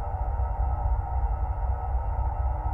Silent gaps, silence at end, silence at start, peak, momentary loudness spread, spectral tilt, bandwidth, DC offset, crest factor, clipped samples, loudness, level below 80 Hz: none; 0 s; 0 s; -16 dBFS; 1 LU; -11 dB/octave; 2.9 kHz; under 0.1%; 10 dB; under 0.1%; -30 LUFS; -28 dBFS